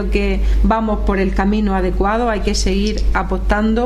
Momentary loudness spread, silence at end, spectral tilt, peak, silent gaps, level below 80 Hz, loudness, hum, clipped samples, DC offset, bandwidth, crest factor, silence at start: 2 LU; 0 s; -6 dB/octave; -2 dBFS; none; -18 dBFS; -17 LUFS; none; under 0.1%; under 0.1%; 10.5 kHz; 12 dB; 0 s